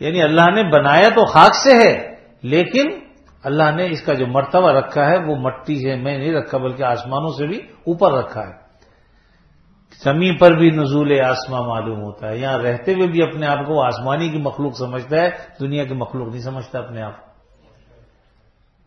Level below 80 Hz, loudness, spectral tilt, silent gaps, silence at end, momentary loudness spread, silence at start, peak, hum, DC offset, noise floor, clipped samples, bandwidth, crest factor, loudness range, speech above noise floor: -52 dBFS; -16 LUFS; -6 dB/octave; none; 1.7 s; 17 LU; 0 s; 0 dBFS; none; under 0.1%; -56 dBFS; under 0.1%; 8.4 kHz; 16 dB; 10 LU; 40 dB